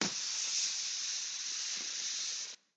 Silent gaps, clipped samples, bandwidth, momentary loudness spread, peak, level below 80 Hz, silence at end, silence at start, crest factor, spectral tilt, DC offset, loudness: none; under 0.1%; 9.6 kHz; 4 LU; -16 dBFS; under -90 dBFS; 0.2 s; 0 s; 20 dB; 1 dB/octave; under 0.1%; -35 LUFS